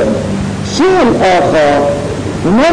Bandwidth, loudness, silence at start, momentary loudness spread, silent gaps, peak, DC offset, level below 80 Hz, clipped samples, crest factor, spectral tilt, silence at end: 10.5 kHz; -11 LUFS; 0 s; 8 LU; none; -4 dBFS; under 0.1%; -32 dBFS; under 0.1%; 6 dB; -5.5 dB/octave; 0 s